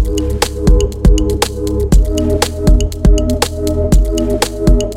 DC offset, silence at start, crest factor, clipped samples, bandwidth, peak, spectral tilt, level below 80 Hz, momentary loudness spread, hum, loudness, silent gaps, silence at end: under 0.1%; 0 s; 12 dB; under 0.1%; 16 kHz; 0 dBFS; -5.5 dB/octave; -14 dBFS; 3 LU; none; -14 LUFS; none; 0 s